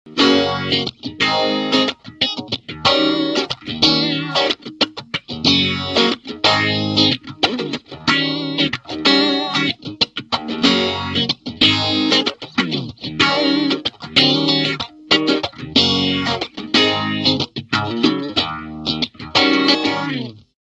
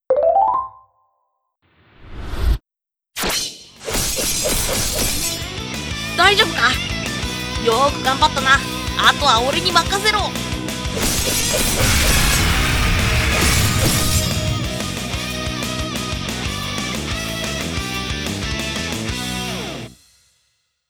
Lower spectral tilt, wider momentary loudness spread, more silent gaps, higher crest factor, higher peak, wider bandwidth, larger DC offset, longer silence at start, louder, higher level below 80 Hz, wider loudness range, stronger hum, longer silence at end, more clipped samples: about the same, -4 dB/octave vs -3 dB/octave; about the same, 9 LU vs 10 LU; neither; about the same, 18 dB vs 20 dB; about the same, 0 dBFS vs 0 dBFS; second, 10.5 kHz vs 20 kHz; neither; about the same, 0.05 s vs 0.1 s; about the same, -17 LUFS vs -18 LUFS; second, -50 dBFS vs -28 dBFS; second, 2 LU vs 8 LU; neither; second, 0.3 s vs 0.95 s; neither